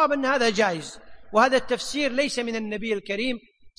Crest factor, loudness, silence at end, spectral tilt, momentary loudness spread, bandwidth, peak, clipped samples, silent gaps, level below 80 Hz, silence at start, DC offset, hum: 20 dB; -24 LUFS; 0.1 s; -3.5 dB/octave; 9 LU; 10.5 kHz; -6 dBFS; under 0.1%; none; -54 dBFS; 0 s; under 0.1%; none